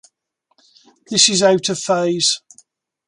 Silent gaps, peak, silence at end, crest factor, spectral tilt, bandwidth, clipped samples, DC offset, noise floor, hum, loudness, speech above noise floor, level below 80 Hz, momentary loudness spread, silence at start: none; 0 dBFS; 0.7 s; 20 dB; -2.5 dB/octave; 11.5 kHz; under 0.1%; under 0.1%; -69 dBFS; none; -15 LUFS; 53 dB; -64 dBFS; 8 LU; 1.1 s